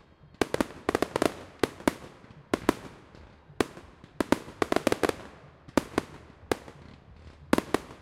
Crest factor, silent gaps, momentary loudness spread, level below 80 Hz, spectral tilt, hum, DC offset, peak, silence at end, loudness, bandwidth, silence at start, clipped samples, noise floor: 28 dB; none; 22 LU; -54 dBFS; -4.5 dB/octave; none; under 0.1%; -2 dBFS; 0.1 s; -30 LUFS; 16 kHz; 0.4 s; under 0.1%; -52 dBFS